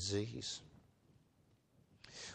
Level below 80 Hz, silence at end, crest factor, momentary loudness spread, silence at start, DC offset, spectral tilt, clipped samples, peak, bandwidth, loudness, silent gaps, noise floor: -74 dBFS; 0 s; 22 dB; 23 LU; 0 s; under 0.1%; -4 dB/octave; under 0.1%; -26 dBFS; 9.8 kHz; -44 LUFS; none; -73 dBFS